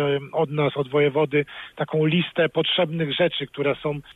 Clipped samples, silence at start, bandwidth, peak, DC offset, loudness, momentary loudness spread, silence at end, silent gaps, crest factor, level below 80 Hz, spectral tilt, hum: under 0.1%; 0 s; 4.1 kHz; -10 dBFS; under 0.1%; -23 LUFS; 5 LU; 0.05 s; none; 14 dB; -60 dBFS; -8 dB/octave; none